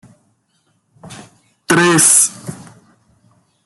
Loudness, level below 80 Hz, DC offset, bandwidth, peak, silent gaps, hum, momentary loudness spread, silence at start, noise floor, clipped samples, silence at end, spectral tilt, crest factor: -10 LUFS; -60 dBFS; under 0.1%; over 20 kHz; 0 dBFS; none; none; 24 LU; 1.05 s; -62 dBFS; under 0.1%; 1.1 s; -2.5 dB/octave; 18 dB